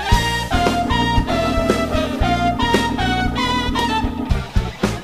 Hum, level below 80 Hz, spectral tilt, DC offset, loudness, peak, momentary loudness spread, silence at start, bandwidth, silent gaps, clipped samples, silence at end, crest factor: none; -26 dBFS; -5 dB/octave; 0.6%; -19 LUFS; 0 dBFS; 4 LU; 0 s; 15.5 kHz; none; under 0.1%; 0 s; 18 dB